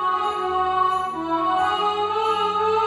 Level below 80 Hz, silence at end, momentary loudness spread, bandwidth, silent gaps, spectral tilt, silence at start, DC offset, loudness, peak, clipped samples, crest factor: -54 dBFS; 0 s; 3 LU; 12 kHz; none; -4 dB/octave; 0 s; under 0.1%; -22 LUFS; -10 dBFS; under 0.1%; 12 dB